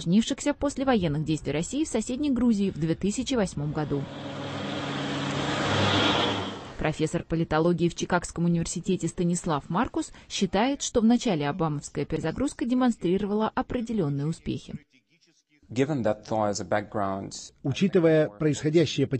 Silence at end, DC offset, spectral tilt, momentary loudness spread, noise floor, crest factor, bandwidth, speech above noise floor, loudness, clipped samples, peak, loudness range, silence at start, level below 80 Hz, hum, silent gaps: 0 s; under 0.1%; -5.5 dB/octave; 9 LU; -66 dBFS; 18 dB; 8.8 kHz; 39 dB; -27 LUFS; under 0.1%; -10 dBFS; 4 LU; 0 s; -48 dBFS; none; none